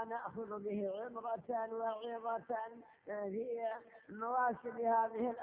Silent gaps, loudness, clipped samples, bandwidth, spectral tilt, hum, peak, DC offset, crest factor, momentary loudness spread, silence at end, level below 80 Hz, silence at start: none; -40 LUFS; under 0.1%; 3.8 kHz; -4.5 dB/octave; none; -24 dBFS; under 0.1%; 16 dB; 10 LU; 0 s; -82 dBFS; 0 s